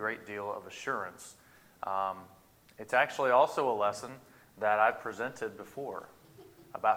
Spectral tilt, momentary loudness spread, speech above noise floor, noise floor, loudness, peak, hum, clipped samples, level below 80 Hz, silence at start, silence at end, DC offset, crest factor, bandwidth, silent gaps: -4 dB/octave; 20 LU; 24 dB; -56 dBFS; -32 LUFS; -12 dBFS; none; under 0.1%; -76 dBFS; 0 s; 0 s; under 0.1%; 22 dB; 16.5 kHz; none